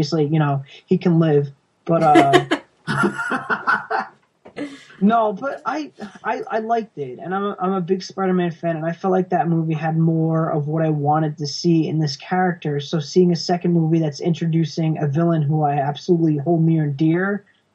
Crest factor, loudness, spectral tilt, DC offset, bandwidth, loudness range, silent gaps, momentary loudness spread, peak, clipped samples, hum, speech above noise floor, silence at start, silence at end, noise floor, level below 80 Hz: 20 dB; -20 LUFS; -7 dB/octave; under 0.1%; 11.5 kHz; 5 LU; none; 9 LU; 0 dBFS; under 0.1%; none; 29 dB; 0 s; 0.35 s; -47 dBFS; -64 dBFS